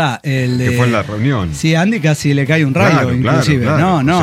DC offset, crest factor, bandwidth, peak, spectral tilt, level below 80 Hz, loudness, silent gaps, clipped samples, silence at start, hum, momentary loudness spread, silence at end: under 0.1%; 12 dB; 15 kHz; -2 dBFS; -6.5 dB/octave; -40 dBFS; -13 LUFS; none; under 0.1%; 0 s; none; 5 LU; 0 s